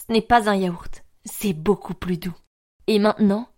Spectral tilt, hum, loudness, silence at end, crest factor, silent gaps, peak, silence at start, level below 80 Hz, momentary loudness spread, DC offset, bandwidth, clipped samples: -6 dB/octave; none; -22 LUFS; 0.15 s; 18 dB; 2.47-2.80 s; -4 dBFS; 0 s; -44 dBFS; 17 LU; under 0.1%; 16.5 kHz; under 0.1%